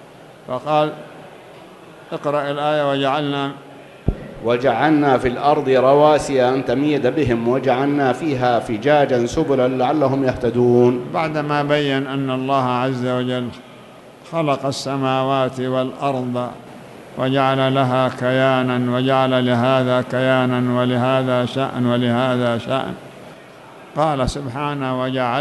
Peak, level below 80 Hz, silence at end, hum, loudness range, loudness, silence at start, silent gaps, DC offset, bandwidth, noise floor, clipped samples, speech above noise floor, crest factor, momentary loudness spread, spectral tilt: 0 dBFS; -42 dBFS; 0 s; none; 5 LU; -18 LUFS; 0 s; none; under 0.1%; 12 kHz; -41 dBFS; under 0.1%; 24 dB; 18 dB; 11 LU; -6.5 dB/octave